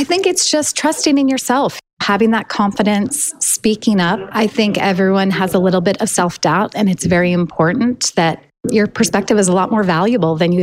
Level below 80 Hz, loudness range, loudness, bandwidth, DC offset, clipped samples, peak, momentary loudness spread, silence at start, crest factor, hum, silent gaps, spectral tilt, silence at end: -50 dBFS; 1 LU; -15 LUFS; 16 kHz; under 0.1%; under 0.1%; -2 dBFS; 3 LU; 0 s; 12 dB; none; 1.93-1.97 s; -4.5 dB/octave; 0 s